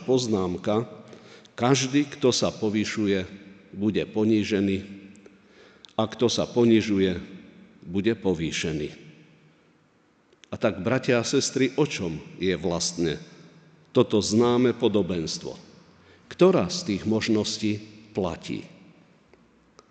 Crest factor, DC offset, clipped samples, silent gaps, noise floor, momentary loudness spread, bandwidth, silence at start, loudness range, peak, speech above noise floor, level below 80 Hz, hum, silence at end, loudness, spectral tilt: 18 dB; under 0.1%; under 0.1%; none; -62 dBFS; 15 LU; 9.2 kHz; 0 s; 5 LU; -8 dBFS; 38 dB; -58 dBFS; none; 1.25 s; -25 LUFS; -5 dB/octave